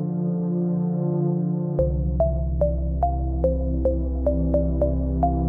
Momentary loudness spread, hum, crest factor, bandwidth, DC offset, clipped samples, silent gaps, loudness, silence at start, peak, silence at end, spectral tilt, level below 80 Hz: 2 LU; none; 14 dB; 1.7 kHz; under 0.1%; under 0.1%; none; -24 LUFS; 0 s; -8 dBFS; 0 s; -14 dB/octave; -26 dBFS